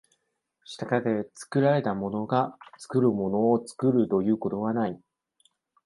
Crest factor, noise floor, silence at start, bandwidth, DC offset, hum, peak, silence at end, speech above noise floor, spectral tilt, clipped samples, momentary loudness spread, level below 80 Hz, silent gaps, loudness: 18 dB; -76 dBFS; 0.7 s; 11.5 kHz; under 0.1%; none; -8 dBFS; 0.9 s; 51 dB; -7.5 dB/octave; under 0.1%; 9 LU; -64 dBFS; none; -26 LUFS